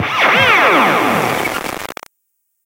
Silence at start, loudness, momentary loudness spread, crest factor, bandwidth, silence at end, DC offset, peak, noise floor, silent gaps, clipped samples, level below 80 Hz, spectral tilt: 0 s; -12 LUFS; 18 LU; 14 dB; 17 kHz; 0.7 s; under 0.1%; 0 dBFS; -68 dBFS; none; under 0.1%; -50 dBFS; -3.5 dB/octave